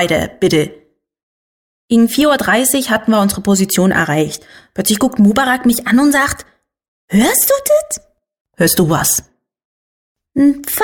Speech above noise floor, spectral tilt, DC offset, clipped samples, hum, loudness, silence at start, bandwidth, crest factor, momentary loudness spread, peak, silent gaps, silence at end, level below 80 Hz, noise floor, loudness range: over 77 dB; -4 dB/octave; under 0.1%; under 0.1%; none; -13 LUFS; 0 s; 18 kHz; 14 dB; 7 LU; 0 dBFS; 1.23-1.88 s, 6.88-7.08 s, 8.41-8.45 s, 9.65-10.15 s; 0 s; -44 dBFS; under -90 dBFS; 2 LU